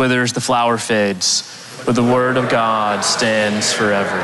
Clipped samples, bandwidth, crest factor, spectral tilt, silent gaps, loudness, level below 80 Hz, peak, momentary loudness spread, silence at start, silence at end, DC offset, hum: under 0.1%; 12.5 kHz; 10 dB; -3.5 dB/octave; none; -16 LUFS; -54 dBFS; -6 dBFS; 3 LU; 0 s; 0 s; under 0.1%; none